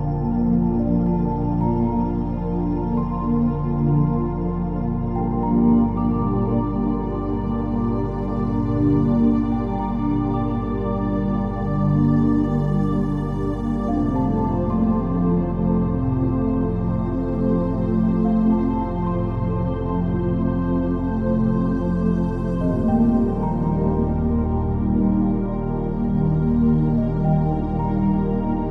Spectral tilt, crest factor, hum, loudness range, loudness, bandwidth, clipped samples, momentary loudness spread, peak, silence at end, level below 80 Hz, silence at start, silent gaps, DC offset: -11.5 dB/octave; 14 dB; none; 1 LU; -21 LUFS; 4.3 kHz; under 0.1%; 5 LU; -6 dBFS; 0 s; -30 dBFS; 0 s; none; under 0.1%